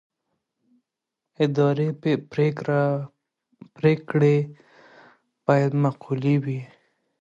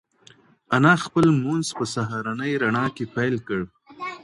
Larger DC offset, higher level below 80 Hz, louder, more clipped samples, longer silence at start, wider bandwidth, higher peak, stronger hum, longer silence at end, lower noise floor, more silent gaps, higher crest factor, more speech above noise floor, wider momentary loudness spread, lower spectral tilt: neither; second, -68 dBFS vs -58 dBFS; about the same, -23 LUFS vs -22 LUFS; neither; first, 1.4 s vs 0.7 s; second, 7.6 kHz vs 11.5 kHz; about the same, -6 dBFS vs -4 dBFS; neither; first, 0.55 s vs 0.05 s; first, -85 dBFS vs -54 dBFS; neither; about the same, 18 dB vs 20 dB; first, 63 dB vs 32 dB; about the same, 10 LU vs 12 LU; first, -9 dB/octave vs -6 dB/octave